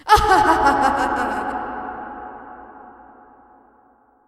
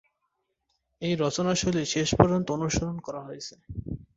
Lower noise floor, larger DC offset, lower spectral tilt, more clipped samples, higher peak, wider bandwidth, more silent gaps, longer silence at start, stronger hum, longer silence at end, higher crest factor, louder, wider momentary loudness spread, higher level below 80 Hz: second, -56 dBFS vs -78 dBFS; neither; about the same, -4 dB/octave vs -5 dB/octave; neither; first, 0 dBFS vs -4 dBFS; first, 15 kHz vs 8 kHz; neither; second, 0.05 s vs 1 s; neither; first, 1.4 s vs 0.15 s; second, 20 dB vs 26 dB; first, -18 LUFS vs -26 LUFS; first, 23 LU vs 16 LU; first, -38 dBFS vs -46 dBFS